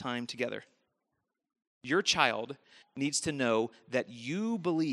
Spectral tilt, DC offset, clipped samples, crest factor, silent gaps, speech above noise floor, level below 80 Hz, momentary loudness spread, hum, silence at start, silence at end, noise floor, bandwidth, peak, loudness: -3.5 dB/octave; under 0.1%; under 0.1%; 26 dB; 1.67-1.81 s; 52 dB; -72 dBFS; 17 LU; none; 0 s; 0 s; -85 dBFS; 12.5 kHz; -8 dBFS; -32 LUFS